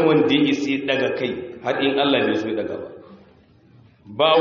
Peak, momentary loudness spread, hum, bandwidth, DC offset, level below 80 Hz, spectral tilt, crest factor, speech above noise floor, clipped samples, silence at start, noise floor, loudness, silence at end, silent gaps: -2 dBFS; 13 LU; none; 7.2 kHz; under 0.1%; -62 dBFS; -3 dB/octave; 18 dB; 32 dB; under 0.1%; 0 s; -52 dBFS; -21 LUFS; 0 s; none